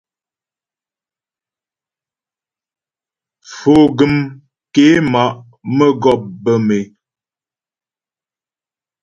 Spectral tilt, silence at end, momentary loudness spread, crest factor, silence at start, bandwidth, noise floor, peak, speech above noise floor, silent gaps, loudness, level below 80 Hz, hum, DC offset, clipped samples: -6.5 dB/octave; 2.15 s; 13 LU; 16 dB; 3.5 s; 7.6 kHz; under -90 dBFS; 0 dBFS; over 78 dB; none; -13 LUFS; -52 dBFS; none; under 0.1%; under 0.1%